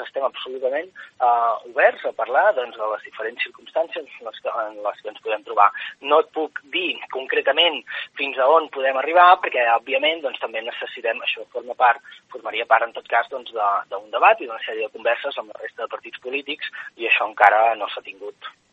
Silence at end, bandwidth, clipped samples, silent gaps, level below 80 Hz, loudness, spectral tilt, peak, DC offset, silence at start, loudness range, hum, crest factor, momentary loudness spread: 0.25 s; 7.4 kHz; under 0.1%; none; -80 dBFS; -21 LUFS; -3 dB/octave; 0 dBFS; under 0.1%; 0 s; 5 LU; none; 22 dB; 14 LU